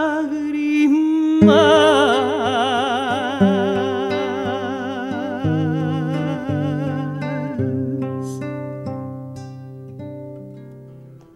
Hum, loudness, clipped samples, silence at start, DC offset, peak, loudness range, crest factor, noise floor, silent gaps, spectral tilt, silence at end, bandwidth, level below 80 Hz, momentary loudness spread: none; -19 LUFS; under 0.1%; 0 s; under 0.1%; 0 dBFS; 12 LU; 18 dB; -41 dBFS; none; -6.5 dB/octave; 0.2 s; 12 kHz; -56 dBFS; 21 LU